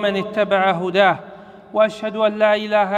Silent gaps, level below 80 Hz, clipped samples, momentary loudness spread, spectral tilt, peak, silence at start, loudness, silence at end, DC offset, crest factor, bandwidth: none; -62 dBFS; under 0.1%; 5 LU; -6 dB/octave; -2 dBFS; 0 s; -18 LUFS; 0 s; under 0.1%; 16 dB; 8.8 kHz